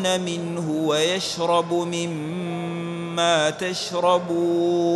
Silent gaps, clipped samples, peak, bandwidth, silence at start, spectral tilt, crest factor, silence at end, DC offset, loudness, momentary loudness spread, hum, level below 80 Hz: none; under 0.1%; -6 dBFS; 12 kHz; 0 s; -4.5 dB/octave; 16 dB; 0 s; under 0.1%; -23 LUFS; 8 LU; none; -66 dBFS